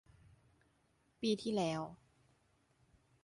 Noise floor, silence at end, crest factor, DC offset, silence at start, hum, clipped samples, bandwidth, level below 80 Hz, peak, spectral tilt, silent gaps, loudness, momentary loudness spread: -76 dBFS; 1.3 s; 20 dB; under 0.1%; 1.2 s; none; under 0.1%; 11.5 kHz; -74 dBFS; -24 dBFS; -5.5 dB/octave; none; -39 LUFS; 8 LU